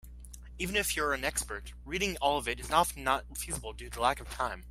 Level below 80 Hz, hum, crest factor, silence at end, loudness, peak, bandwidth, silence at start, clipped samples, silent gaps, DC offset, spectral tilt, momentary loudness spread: -46 dBFS; 60 Hz at -45 dBFS; 22 dB; 0 s; -32 LUFS; -10 dBFS; 16 kHz; 0.05 s; under 0.1%; none; under 0.1%; -2.5 dB/octave; 13 LU